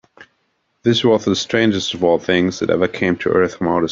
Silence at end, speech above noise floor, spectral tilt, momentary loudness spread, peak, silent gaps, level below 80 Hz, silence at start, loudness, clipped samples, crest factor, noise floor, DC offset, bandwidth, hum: 0 s; 50 dB; -5 dB/octave; 3 LU; -2 dBFS; none; -54 dBFS; 0.2 s; -17 LUFS; under 0.1%; 16 dB; -67 dBFS; under 0.1%; 7.6 kHz; none